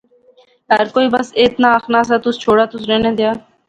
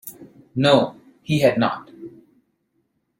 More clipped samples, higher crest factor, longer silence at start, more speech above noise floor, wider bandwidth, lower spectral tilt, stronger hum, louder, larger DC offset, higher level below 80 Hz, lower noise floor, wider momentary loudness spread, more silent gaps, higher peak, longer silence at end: neither; second, 14 dB vs 20 dB; first, 0.7 s vs 0.05 s; second, 37 dB vs 52 dB; second, 9.2 kHz vs 16.5 kHz; about the same, -5 dB/octave vs -6 dB/octave; neither; first, -14 LUFS vs -20 LUFS; neither; first, -50 dBFS vs -60 dBFS; second, -51 dBFS vs -70 dBFS; second, 4 LU vs 24 LU; neither; about the same, 0 dBFS vs -2 dBFS; second, 0.3 s vs 1.1 s